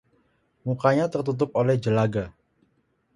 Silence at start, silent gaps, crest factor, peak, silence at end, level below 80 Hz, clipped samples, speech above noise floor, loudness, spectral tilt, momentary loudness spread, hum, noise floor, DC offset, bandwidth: 0.65 s; none; 20 dB; -4 dBFS; 0.85 s; -56 dBFS; under 0.1%; 46 dB; -24 LUFS; -8 dB/octave; 10 LU; none; -69 dBFS; under 0.1%; 11 kHz